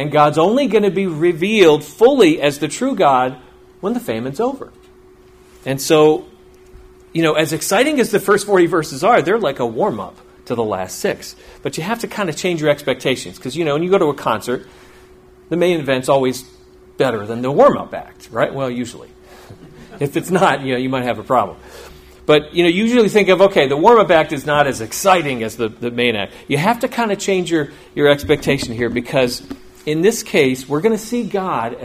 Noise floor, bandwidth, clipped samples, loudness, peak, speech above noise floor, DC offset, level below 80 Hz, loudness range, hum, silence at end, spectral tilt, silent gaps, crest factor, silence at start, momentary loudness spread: -45 dBFS; 15.5 kHz; under 0.1%; -16 LUFS; 0 dBFS; 30 dB; under 0.1%; -48 dBFS; 6 LU; none; 0 s; -5 dB/octave; none; 16 dB; 0 s; 12 LU